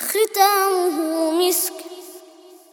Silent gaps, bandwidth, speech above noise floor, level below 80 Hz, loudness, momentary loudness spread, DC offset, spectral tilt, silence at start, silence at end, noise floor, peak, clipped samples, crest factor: none; over 20 kHz; 28 dB; -78 dBFS; -19 LUFS; 20 LU; under 0.1%; 0 dB/octave; 0 s; 0.55 s; -46 dBFS; -2 dBFS; under 0.1%; 18 dB